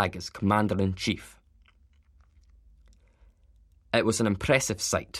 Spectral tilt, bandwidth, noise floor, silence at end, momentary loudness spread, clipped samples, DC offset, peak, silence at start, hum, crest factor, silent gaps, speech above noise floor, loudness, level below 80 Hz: -4.5 dB/octave; 15.5 kHz; -61 dBFS; 0 s; 6 LU; under 0.1%; under 0.1%; -6 dBFS; 0 s; none; 24 dB; none; 34 dB; -27 LUFS; -52 dBFS